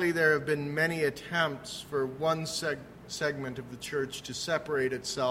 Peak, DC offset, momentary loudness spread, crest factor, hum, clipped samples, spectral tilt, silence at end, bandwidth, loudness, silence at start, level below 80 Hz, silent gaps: -12 dBFS; under 0.1%; 11 LU; 20 dB; none; under 0.1%; -4 dB/octave; 0 s; 16 kHz; -31 LUFS; 0 s; -62 dBFS; none